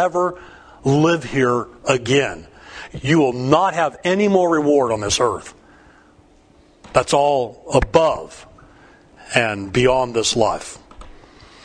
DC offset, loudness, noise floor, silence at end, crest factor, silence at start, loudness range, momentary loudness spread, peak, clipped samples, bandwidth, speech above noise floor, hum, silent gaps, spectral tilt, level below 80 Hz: under 0.1%; -18 LUFS; -51 dBFS; 0.55 s; 20 dB; 0 s; 3 LU; 13 LU; 0 dBFS; under 0.1%; 10.5 kHz; 34 dB; none; none; -4.5 dB/octave; -42 dBFS